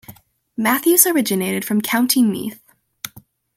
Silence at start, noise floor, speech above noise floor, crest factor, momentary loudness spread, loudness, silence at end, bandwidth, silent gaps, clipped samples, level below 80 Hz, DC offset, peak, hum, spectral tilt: 0.1 s; -47 dBFS; 30 dB; 20 dB; 21 LU; -16 LUFS; 0.35 s; 17 kHz; none; under 0.1%; -64 dBFS; under 0.1%; 0 dBFS; none; -3 dB/octave